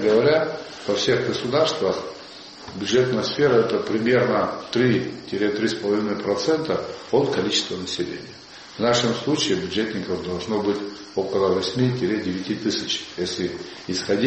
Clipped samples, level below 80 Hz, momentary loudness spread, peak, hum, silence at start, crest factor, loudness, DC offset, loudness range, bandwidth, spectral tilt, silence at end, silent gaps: under 0.1%; -58 dBFS; 10 LU; -6 dBFS; none; 0 s; 16 dB; -23 LUFS; under 0.1%; 3 LU; 8.4 kHz; -4.5 dB/octave; 0 s; none